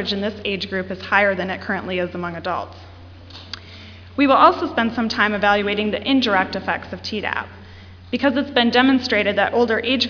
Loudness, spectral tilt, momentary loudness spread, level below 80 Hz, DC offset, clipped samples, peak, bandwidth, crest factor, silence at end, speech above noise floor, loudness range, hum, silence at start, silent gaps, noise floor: -19 LUFS; -5.5 dB/octave; 19 LU; -52 dBFS; under 0.1%; under 0.1%; 0 dBFS; 5.4 kHz; 20 dB; 0 s; 21 dB; 6 LU; none; 0 s; none; -40 dBFS